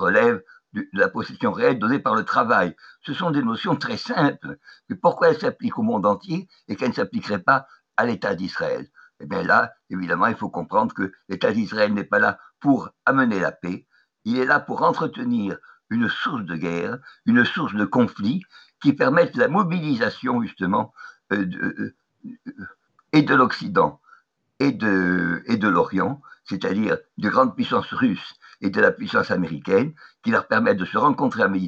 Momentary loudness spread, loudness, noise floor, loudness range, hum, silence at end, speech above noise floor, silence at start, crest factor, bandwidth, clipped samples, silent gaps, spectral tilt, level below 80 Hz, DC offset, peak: 12 LU; -22 LUFS; -57 dBFS; 3 LU; none; 0 s; 35 dB; 0 s; 18 dB; 7.4 kHz; under 0.1%; none; -7 dB/octave; -68 dBFS; under 0.1%; -4 dBFS